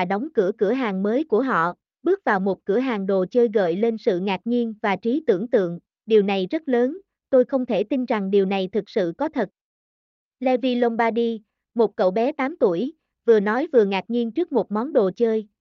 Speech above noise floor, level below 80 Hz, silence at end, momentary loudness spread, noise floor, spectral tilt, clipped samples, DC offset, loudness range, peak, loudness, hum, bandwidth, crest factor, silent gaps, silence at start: over 69 dB; -70 dBFS; 0.15 s; 6 LU; under -90 dBFS; -8 dB/octave; under 0.1%; under 0.1%; 2 LU; -6 dBFS; -22 LUFS; none; 6.4 kHz; 16 dB; 9.61-10.31 s; 0 s